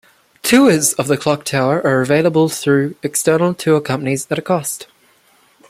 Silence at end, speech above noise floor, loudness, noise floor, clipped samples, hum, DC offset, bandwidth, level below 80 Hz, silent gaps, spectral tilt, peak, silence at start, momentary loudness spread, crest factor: 0.85 s; 39 dB; -15 LUFS; -54 dBFS; under 0.1%; none; under 0.1%; 16 kHz; -56 dBFS; none; -4.5 dB/octave; 0 dBFS; 0.45 s; 8 LU; 16 dB